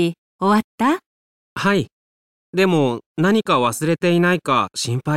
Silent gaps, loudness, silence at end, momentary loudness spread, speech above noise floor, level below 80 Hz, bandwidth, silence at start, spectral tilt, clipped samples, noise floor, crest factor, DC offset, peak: 0.18-0.39 s, 0.64-0.78 s, 1.06-1.56 s, 1.92-2.53 s, 3.06-3.15 s; -19 LUFS; 0 s; 7 LU; over 72 dB; -60 dBFS; 15.5 kHz; 0 s; -5.5 dB/octave; under 0.1%; under -90 dBFS; 14 dB; 0.3%; -4 dBFS